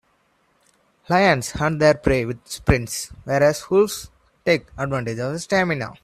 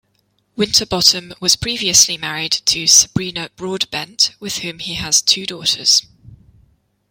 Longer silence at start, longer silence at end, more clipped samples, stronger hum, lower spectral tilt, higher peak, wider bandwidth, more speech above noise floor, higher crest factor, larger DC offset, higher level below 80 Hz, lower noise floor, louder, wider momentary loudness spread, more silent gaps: first, 1.1 s vs 0.55 s; second, 0.1 s vs 0.75 s; neither; neither; first, -5 dB/octave vs -1 dB/octave; about the same, -2 dBFS vs 0 dBFS; about the same, 15 kHz vs 16.5 kHz; second, 43 dB vs 47 dB; about the same, 20 dB vs 18 dB; neither; first, -40 dBFS vs -48 dBFS; about the same, -64 dBFS vs -64 dBFS; second, -21 LUFS vs -14 LUFS; second, 10 LU vs 13 LU; neither